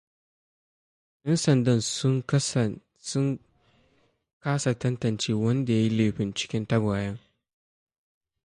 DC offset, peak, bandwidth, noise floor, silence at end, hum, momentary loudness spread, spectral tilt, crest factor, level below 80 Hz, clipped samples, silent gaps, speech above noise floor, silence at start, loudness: under 0.1%; -10 dBFS; 11.5 kHz; -67 dBFS; 1.3 s; none; 11 LU; -5.5 dB/octave; 18 dB; -58 dBFS; under 0.1%; 4.33-4.41 s; 42 dB; 1.25 s; -26 LUFS